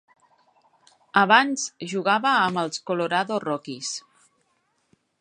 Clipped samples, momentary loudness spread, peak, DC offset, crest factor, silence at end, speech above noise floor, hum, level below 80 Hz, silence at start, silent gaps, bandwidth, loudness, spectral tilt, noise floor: under 0.1%; 13 LU; -2 dBFS; under 0.1%; 22 dB; 1.2 s; 47 dB; none; -78 dBFS; 1.15 s; none; 11 kHz; -23 LUFS; -3 dB/octave; -70 dBFS